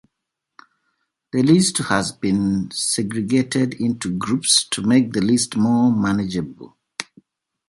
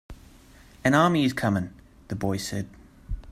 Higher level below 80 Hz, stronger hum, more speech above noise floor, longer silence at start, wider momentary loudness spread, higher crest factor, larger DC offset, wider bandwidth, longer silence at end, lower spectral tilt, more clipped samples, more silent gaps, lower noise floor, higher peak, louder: second, -52 dBFS vs -44 dBFS; neither; first, 62 dB vs 27 dB; first, 1.35 s vs 0.1 s; second, 12 LU vs 20 LU; about the same, 18 dB vs 22 dB; neither; second, 11.5 kHz vs 15.5 kHz; first, 0.65 s vs 0 s; second, -4 dB/octave vs -5.5 dB/octave; neither; neither; first, -80 dBFS vs -51 dBFS; first, -2 dBFS vs -6 dBFS; first, -19 LUFS vs -25 LUFS